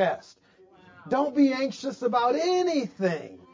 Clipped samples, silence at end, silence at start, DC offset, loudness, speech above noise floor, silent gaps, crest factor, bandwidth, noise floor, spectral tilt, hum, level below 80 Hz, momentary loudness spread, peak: under 0.1%; 0.15 s; 0 s; under 0.1%; -26 LUFS; 31 dB; none; 16 dB; 7.6 kHz; -57 dBFS; -5.5 dB/octave; none; -70 dBFS; 8 LU; -12 dBFS